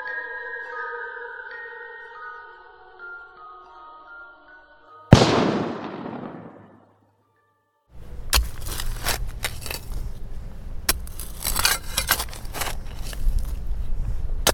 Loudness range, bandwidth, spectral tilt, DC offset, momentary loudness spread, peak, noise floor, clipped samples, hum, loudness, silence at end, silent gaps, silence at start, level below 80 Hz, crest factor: 14 LU; 18 kHz; -4 dB/octave; under 0.1%; 22 LU; 0 dBFS; -67 dBFS; under 0.1%; none; -25 LUFS; 0 s; none; 0 s; -32 dBFS; 26 dB